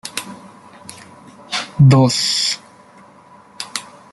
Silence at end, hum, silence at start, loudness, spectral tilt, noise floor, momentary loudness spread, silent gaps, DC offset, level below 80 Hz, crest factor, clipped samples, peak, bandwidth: 0.3 s; none; 0.05 s; -16 LUFS; -5 dB/octave; -45 dBFS; 26 LU; none; under 0.1%; -54 dBFS; 18 dB; under 0.1%; -2 dBFS; 12 kHz